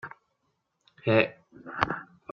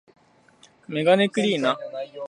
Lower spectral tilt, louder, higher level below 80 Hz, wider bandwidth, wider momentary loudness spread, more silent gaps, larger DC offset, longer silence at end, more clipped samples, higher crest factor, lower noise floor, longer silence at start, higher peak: first, -7 dB/octave vs -5.5 dB/octave; second, -28 LUFS vs -22 LUFS; first, -62 dBFS vs -76 dBFS; second, 6.6 kHz vs 10.5 kHz; first, 20 LU vs 12 LU; neither; neither; first, 0.3 s vs 0.05 s; neither; first, 28 dB vs 20 dB; first, -77 dBFS vs -56 dBFS; second, 0.05 s vs 0.9 s; about the same, -4 dBFS vs -4 dBFS